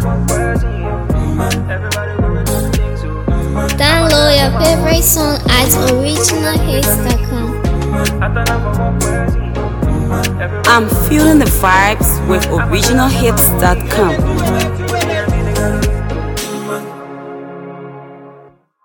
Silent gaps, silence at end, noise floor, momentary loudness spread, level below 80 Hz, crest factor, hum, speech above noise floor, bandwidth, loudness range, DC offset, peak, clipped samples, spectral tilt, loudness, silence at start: none; 0.45 s; -43 dBFS; 10 LU; -20 dBFS; 12 dB; none; 31 dB; 19.5 kHz; 6 LU; under 0.1%; 0 dBFS; under 0.1%; -4.5 dB/octave; -13 LUFS; 0 s